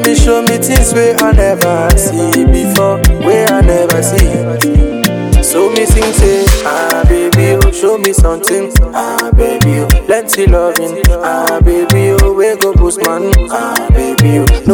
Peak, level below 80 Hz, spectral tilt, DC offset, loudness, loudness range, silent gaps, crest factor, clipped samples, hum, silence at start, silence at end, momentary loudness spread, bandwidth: 0 dBFS; -12 dBFS; -5 dB/octave; under 0.1%; -10 LUFS; 1 LU; none; 8 dB; 0.9%; none; 0 s; 0 s; 4 LU; 19.5 kHz